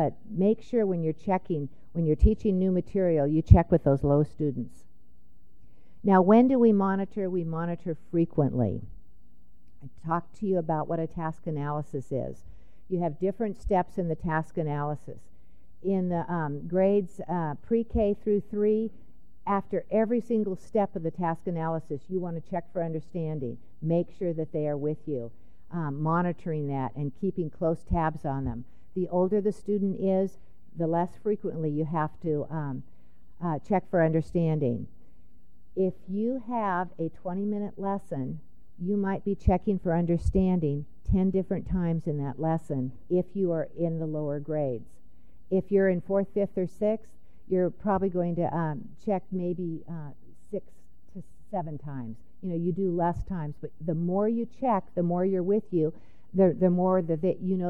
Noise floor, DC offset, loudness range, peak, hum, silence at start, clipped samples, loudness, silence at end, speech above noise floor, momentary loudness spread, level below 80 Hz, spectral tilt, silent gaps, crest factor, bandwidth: -60 dBFS; 0.9%; 7 LU; -2 dBFS; none; 0 s; under 0.1%; -28 LUFS; 0 s; 33 dB; 11 LU; -42 dBFS; -10.5 dB/octave; none; 26 dB; 8.4 kHz